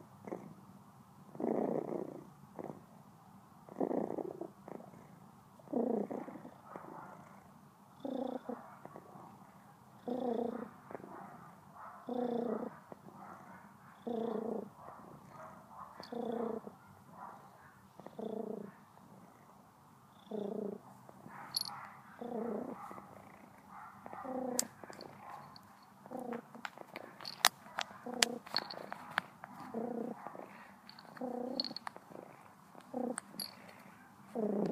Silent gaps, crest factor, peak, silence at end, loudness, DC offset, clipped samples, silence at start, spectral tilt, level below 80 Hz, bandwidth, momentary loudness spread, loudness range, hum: none; 40 dB; -4 dBFS; 0 s; -41 LUFS; under 0.1%; under 0.1%; 0 s; -3 dB/octave; -84 dBFS; 15.5 kHz; 21 LU; 9 LU; none